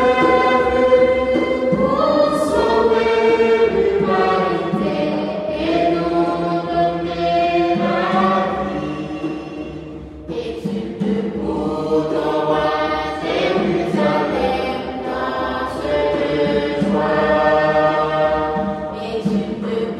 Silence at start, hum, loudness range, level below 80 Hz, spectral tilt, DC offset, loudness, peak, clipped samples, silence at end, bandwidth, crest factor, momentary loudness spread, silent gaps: 0 s; none; 6 LU; -42 dBFS; -6.5 dB/octave; under 0.1%; -18 LUFS; -2 dBFS; under 0.1%; 0 s; 12 kHz; 16 dB; 10 LU; none